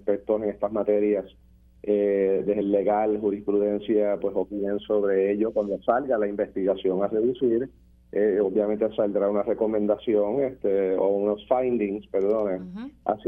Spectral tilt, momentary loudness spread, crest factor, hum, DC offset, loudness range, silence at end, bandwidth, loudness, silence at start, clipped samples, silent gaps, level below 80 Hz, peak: -9.5 dB/octave; 5 LU; 18 dB; none; under 0.1%; 1 LU; 0 s; 3.9 kHz; -25 LUFS; 0.05 s; under 0.1%; none; -56 dBFS; -6 dBFS